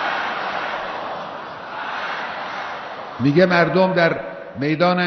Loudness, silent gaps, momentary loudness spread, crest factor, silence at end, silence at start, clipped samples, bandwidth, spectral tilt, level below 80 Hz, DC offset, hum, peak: -21 LUFS; none; 15 LU; 16 dB; 0 s; 0 s; under 0.1%; 6.4 kHz; -4 dB/octave; -58 dBFS; under 0.1%; none; -4 dBFS